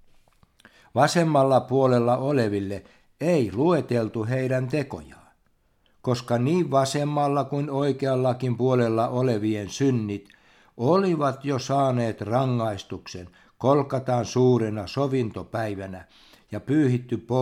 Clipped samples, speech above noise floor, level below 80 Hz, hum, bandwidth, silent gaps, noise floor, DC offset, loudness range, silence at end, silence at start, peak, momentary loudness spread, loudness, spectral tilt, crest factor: under 0.1%; 42 dB; -62 dBFS; none; 13.5 kHz; none; -65 dBFS; under 0.1%; 3 LU; 0 s; 0.95 s; -4 dBFS; 13 LU; -24 LUFS; -7 dB/octave; 20 dB